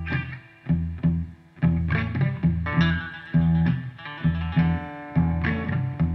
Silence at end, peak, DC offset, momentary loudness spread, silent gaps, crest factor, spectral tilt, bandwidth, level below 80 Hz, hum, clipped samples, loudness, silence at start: 0 s; -8 dBFS; under 0.1%; 8 LU; none; 16 dB; -9.5 dB/octave; 5.6 kHz; -38 dBFS; none; under 0.1%; -25 LUFS; 0 s